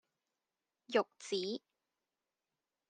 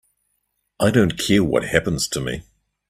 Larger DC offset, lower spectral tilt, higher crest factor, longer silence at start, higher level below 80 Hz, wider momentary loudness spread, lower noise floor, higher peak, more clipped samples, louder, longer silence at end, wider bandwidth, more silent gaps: neither; second, -3.5 dB/octave vs -5 dB/octave; about the same, 24 dB vs 22 dB; about the same, 0.9 s vs 0.8 s; second, under -90 dBFS vs -44 dBFS; about the same, 7 LU vs 9 LU; first, under -90 dBFS vs -72 dBFS; second, -18 dBFS vs 0 dBFS; neither; second, -38 LUFS vs -20 LUFS; first, 1.3 s vs 0.5 s; second, 10 kHz vs 15.5 kHz; neither